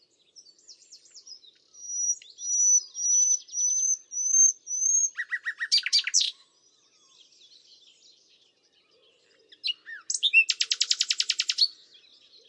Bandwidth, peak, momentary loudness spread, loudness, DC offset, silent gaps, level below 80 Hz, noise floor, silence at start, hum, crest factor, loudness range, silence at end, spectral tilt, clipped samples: 11.5 kHz; -8 dBFS; 12 LU; -23 LUFS; under 0.1%; none; under -90 dBFS; -65 dBFS; 0.7 s; none; 20 dB; 11 LU; 0.75 s; 8 dB/octave; under 0.1%